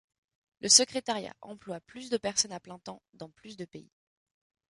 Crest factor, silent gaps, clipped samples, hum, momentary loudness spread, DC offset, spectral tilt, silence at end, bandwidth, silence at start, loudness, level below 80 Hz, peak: 28 dB; 3.09-3.13 s; under 0.1%; none; 26 LU; under 0.1%; -1 dB/octave; 0.9 s; 11.5 kHz; 0.65 s; -26 LUFS; -72 dBFS; -6 dBFS